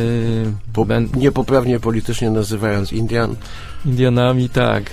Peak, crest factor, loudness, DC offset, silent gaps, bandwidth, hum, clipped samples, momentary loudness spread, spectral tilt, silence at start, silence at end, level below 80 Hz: 0 dBFS; 16 dB; -18 LUFS; under 0.1%; none; 15 kHz; none; under 0.1%; 7 LU; -7 dB/octave; 0 s; 0 s; -34 dBFS